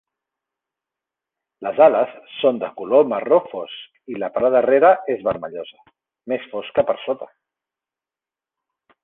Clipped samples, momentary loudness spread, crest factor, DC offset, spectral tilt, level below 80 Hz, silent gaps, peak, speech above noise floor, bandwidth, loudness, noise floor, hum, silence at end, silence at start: under 0.1%; 18 LU; 20 dB; under 0.1%; -8.5 dB/octave; -64 dBFS; none; -2 dBFS; over 71 dB; 4 kHz; -19 LUFS; under -90 dBFS; none; 1.8 s; 1.6 s